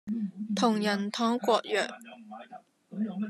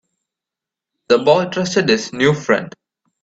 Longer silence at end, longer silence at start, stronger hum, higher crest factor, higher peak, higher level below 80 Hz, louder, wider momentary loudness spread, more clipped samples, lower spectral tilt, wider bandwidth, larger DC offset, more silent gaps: second, 0 s vs 0.55 s; second, 0.05 s vs 1.1 s; neither; about the same, 18 dB vs 18 dB; second, -12 dBFS vs 0 dBFS; second, -80 dBFS vs -56 dBFS; second, -29 LUFS vs -16 LUFS; first, 20 LU vs 5 LU; neither; about the same, -5 dB/octave vs -5 dB/octave; first, 13.5 kHz vs 8 kHz; neither; neither